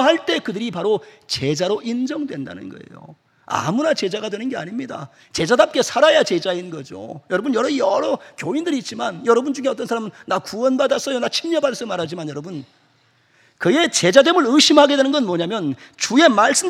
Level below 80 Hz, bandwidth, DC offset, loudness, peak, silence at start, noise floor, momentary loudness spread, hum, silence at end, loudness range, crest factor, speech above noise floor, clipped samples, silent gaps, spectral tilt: -64 dBFS; 15 kHz; under 0.1%; -18 LUFS; 0 dBFS; 0 s; -59 dBFS; 16 LU; none; 0 s; 8 LU; 18 dB; 40 dB; under 0.1%; none; -3.5 dB/octave